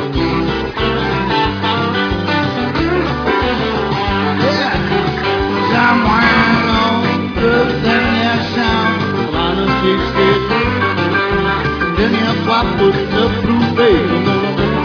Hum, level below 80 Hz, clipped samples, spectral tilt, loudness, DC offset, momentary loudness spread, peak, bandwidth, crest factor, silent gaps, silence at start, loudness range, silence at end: none; -30 dBFS; under 0.1%; -6.5 dB/octave; -14 LUFS; under 0.1%; 5 LU; 0 dBFS; 5.4 kHz; 14 dB; none; 0 s; 3 LU; 0 s